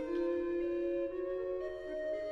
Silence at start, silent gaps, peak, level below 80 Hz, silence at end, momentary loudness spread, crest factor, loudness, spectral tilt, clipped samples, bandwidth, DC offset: 0 s; none; -26 dBFS; -60 dBFS; 0 s; 5 LU; 10 dB; -37 LUFS; -7 dB/octave; under 0.1%; 6 kHz; under 0.1%